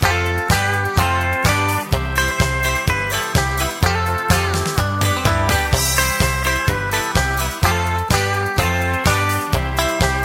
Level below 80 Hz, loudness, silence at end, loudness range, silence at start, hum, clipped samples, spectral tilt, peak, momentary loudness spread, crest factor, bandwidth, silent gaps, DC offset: -28 dBFS; -18 LUFS; 0 s; 1 LU; 0 s; none; under 0.1%; -4 dB/octave; 0 dBFS; 3 LU; 18 dB; 16.5 kHz; none; under 0.1%